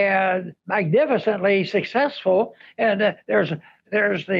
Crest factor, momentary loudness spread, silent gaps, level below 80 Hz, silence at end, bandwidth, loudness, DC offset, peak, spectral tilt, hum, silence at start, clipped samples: 12 dB; 7 LU; none; -70 dBFS; 0 s; 7.2 kHz; -21 LUFS; under 0.1%; -10 dBFS; -7.5 dB/octave; none; 0 s; under 0.1%